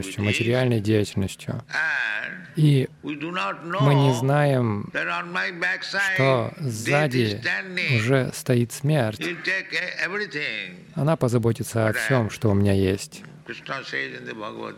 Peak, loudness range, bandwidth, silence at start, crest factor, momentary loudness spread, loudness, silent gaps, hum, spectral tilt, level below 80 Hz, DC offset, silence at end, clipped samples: -4 dBFS; 2 LU; 15.5 kHz; 0 s; 18 dB; 11 LU; -23 LUFS; none; none; -6 dB/octave; -60 dBFS; under 0.1%; 0 s; under 0.1%